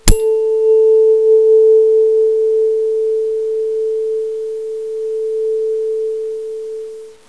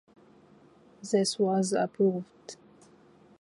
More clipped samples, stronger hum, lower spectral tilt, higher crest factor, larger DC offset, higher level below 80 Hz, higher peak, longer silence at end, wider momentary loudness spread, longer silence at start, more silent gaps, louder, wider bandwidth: neither; neither; about the same, -4.5 dB/octave vs -5 dB/octave; about the same, 14 dB vs 18 dB; first, 0.4% vs under 0.1%; first, -26 dBFS vs -76 dBFS; first, 0 dBFS vs -14 dBFS; second, 0.15 s vs 0.85 s; second, 13 LU vs 21 LU; second, 0.05 s vs 1.05 s; neither; first, -14 LUFS vs -28 LUFS; about the same, 11 kHz vs 11.5 kHz